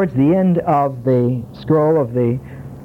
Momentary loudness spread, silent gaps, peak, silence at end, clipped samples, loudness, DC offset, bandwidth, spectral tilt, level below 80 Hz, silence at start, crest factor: 9 LU; none; -4 dBFS; 0 s; under 0.1%; -17 LUFS; under 0.1%; 5.4 kHz; -10.5 dB/octave; -46 dBFS; 0 s; 12 dB